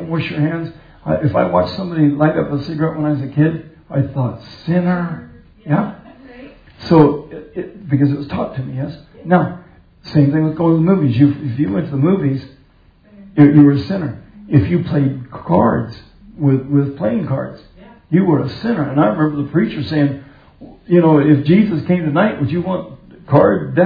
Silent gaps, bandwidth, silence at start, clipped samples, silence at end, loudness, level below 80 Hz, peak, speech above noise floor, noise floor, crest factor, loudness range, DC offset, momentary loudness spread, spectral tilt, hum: none; 5 kHz; 0 s; under 0.1%; 0 s; -16 LUFS; -46 dBFS; 0 dBFS; 34 dB; -49 dBFS; 16 dB; 4 LU; under 0.1%; 14 LU; -10.5 dB/octave; none